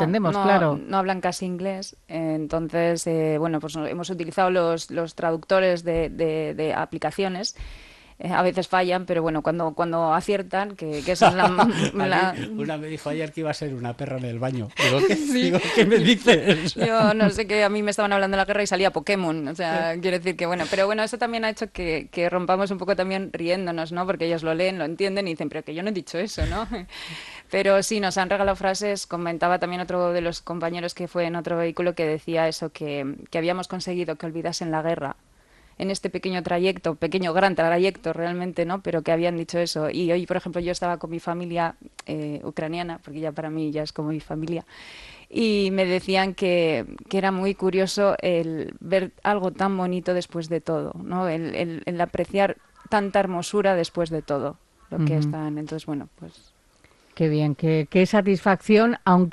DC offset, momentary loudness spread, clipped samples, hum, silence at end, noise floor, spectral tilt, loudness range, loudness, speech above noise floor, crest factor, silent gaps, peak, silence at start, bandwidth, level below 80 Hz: under 0.1%; 10 LU; under 0.1%; none; 0 s; -58 dBFS; -5.5 dB/octave; 7 LU; -24 LUFS; 34 dB; 20 dB; none; -4 dBFS; 0 s; 12.5 kHz; -50 dBFS